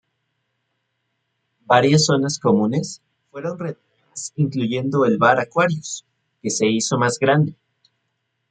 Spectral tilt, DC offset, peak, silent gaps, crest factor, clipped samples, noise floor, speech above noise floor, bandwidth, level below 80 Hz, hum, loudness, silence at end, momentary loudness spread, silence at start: -5 dB/octave; under 0.1%; -2 dBFS; none; 20 dB; under 0.1%; -74 dBFS; 55 dB; 9.4 kHz; -62 dBFS; none; -19 LUFS; 1 s; 16 LU; 1.7 s